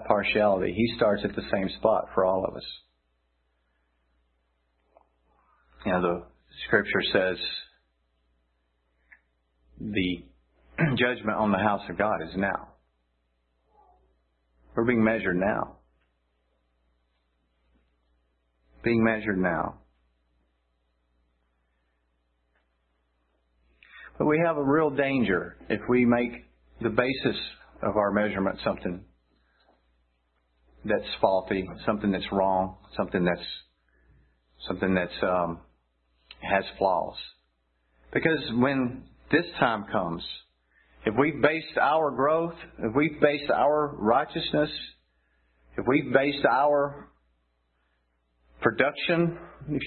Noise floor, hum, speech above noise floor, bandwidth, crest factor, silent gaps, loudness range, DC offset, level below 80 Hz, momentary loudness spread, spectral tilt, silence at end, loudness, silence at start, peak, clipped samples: -73 dBFS; none; 47 dB; 4.5 kHz; 24 dB; none; 7 LU; under 0.1%; -56 dBFS; 13 LU; -10 dB/octave; 0 s; -26 LUFS; 0 s; -6 dBFS; under 0.1%